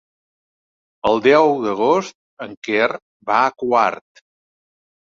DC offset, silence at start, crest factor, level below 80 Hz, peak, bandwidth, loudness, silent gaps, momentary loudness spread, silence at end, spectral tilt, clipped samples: under 0.1%; 1.05 s; 18 dB; -60 dBFS; -2 dBFS; 7.4 kHz; -17 LUFS; 2.15-2.37 s, 2.57-2.62 s, 3.02-3.20 s; 20 LU; 1.15 s; -5 dB/octave; under 0.1%